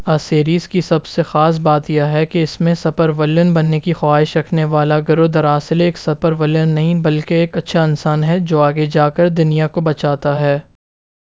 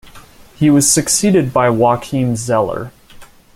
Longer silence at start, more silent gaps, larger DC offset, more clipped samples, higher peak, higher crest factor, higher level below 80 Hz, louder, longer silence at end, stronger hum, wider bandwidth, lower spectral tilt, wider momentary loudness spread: about the same, 0 s vs 0.05 s; neither; first, 0.3% vs under 0.1%; neither; about the same, 0 dBFS vs 0 dBFS; about the same, 14 dB vs 16 dB; about the same, -48 dBFS vs -44 dBFS; about the same, -14 LUFS vs -14 LUFS; first, 0.75 s vs 0.3 s; neither; second, 7.6 kHz vs 16 kHz; first, -8 dB/octave vs -4.5 dB/octave; second, 4 LU vs 9 LU